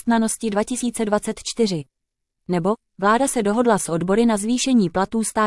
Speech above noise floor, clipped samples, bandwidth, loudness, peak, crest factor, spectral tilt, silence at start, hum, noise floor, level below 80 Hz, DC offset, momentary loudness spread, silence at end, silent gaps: 59 dB; under 0.1%; 12 kHz; -20 LUFS; -4 dBFS; 16 dB; -4.5 dB/octave; 0.05 s; none; -79 dBFS; -50 dBFS; under 0.1%; 5 LU; 0 s; none